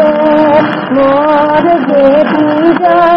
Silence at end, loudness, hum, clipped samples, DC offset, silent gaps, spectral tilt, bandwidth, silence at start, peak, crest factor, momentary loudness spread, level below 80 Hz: 0 s; -8 LUFS; none; 0.6%; 0.4%; none; -8.5 dB/octave; 5.8 kHz; 0 s; 0 dBFS; 8 dB; 3 LU; -44 dBFS